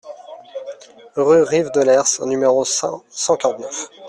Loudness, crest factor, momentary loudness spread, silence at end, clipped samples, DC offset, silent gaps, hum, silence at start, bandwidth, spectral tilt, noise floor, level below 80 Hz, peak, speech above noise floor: -17 LUFS; 16 dB; 19 LU; 0 s; under 0.1%; under 0.1%; none; none; 0.05 s; 12 kHz; -3 dB/octave; -37 dBFS; -62 dBFS; -2 dBFS; 20 dB